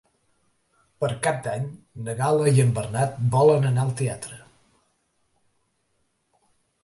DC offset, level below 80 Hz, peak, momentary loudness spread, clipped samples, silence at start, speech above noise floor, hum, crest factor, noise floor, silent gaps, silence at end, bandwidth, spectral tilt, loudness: under 0.1%; -58 dBFS; -6 dBFS; 16 LU; under 0.1%; 1 s; 49 dB; none; 18 dB; -71 dBFS; none; 2.45 s; 11.5 kHz; -6.5 dB/octave; -23 LUFS